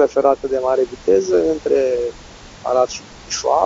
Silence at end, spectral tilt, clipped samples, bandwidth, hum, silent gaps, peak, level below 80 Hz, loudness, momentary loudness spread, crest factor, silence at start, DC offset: 0 s; -4 dB/octave; under 0.1%; 7.8 kHz; none; none; 0 dBFS; -46 dBFS; -18 LUFS; 10 LU; 16 dB; 0 s; under 0.1%